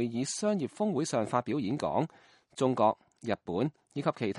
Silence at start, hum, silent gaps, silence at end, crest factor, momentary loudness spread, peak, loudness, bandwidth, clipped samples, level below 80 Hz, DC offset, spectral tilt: 0 s; none; none; 0 s; 18 dB; 8 LU; -12 dBFS; -32 LUFS; 11.5 kHz; under 0.1%; -68 dBFS; under 0.1%; -5.5 dB/octave